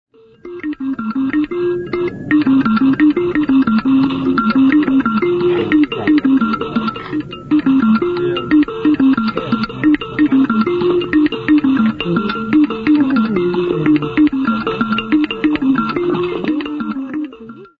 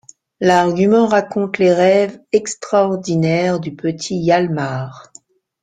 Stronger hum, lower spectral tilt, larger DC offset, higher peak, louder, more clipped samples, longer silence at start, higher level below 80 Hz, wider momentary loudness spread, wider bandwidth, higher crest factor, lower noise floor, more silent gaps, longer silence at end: neither; first, -8.5 dB/octave vs -6 dB/octave; neither; about the same, 0 dBFS vs -2 dBFS; about the same, -15 LUFS vs -16 LUFS; neither; about the same, 0.45 s vs 0.4 s; first, -44 dBFS vs -56 dBFS; about the same, 8 LU vs 9 LU; second, 5.2 kHz vs 9.4 kHz; about the same, 14 dB vs 14 dB; second, -35 dBFS vs -47 dBFS; neither; second, 0.15 s vs 0.6 s